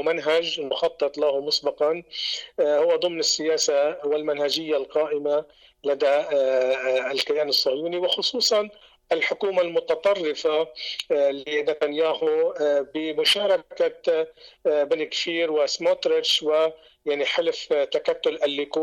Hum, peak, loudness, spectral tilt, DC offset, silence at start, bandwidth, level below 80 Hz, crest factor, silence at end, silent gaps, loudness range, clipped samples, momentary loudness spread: none; -12 dBFS; -23 LUFS; -2 dB/octave; under 0.1%; 0 s; 16.5 kHz; -68 dBFS; 12 dB; 0 s; none; 1 LU; under 0.1%; 6 LU